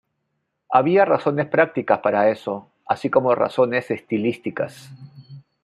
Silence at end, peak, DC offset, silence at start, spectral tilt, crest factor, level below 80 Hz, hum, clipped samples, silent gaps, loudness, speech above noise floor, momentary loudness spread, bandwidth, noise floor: 0.25 s; 0 dBFS; under 0.1%; 0.7 s; -7.5 dB/octave; 20 dB; -68 dBFS; none; under 0.1%; none; -20 LUFS; 55 dB; 11 LU; 12 kHz; -75 dBFS